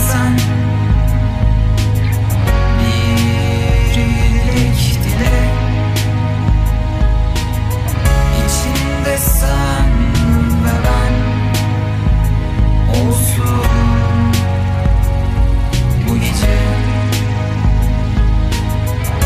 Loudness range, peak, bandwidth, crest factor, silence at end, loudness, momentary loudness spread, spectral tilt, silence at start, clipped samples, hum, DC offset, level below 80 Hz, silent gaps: 1 LU; -2 dBFS; 15.5 kHz; 12 dB; 0 s; -14 LUFS; 3 LU; -5.5 dB/octave; 0 s; under 0.1%; none; under 0.1%; -16 dBFS; none